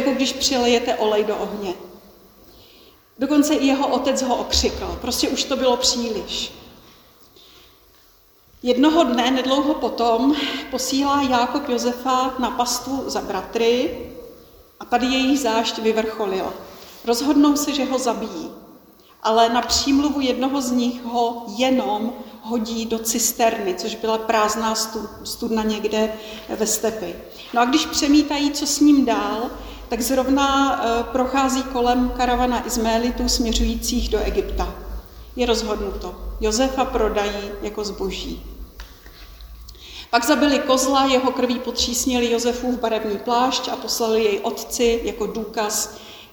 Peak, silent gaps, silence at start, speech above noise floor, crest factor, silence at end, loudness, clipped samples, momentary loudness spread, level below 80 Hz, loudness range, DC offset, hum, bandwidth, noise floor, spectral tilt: -2 dBFS; none; 0 s; 33 dB; 18 dB; 0.05 s; -20 LUFS; under 0.1%; 13 LU; -38 dBFS; 4 LU; under 0.1%; none; over 20 kHz; -54 dBFS; -3 dB/octave